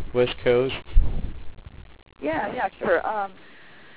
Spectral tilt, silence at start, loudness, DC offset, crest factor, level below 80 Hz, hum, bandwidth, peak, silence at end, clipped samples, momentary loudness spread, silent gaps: -9.5 dB/octave; 0 s; -25 LUFS; under 0.1%; 18 dB; -30 dBFS; none; 4 kHz; -6 dBFS; 0.65 s; under 0.1%; 22 LU; none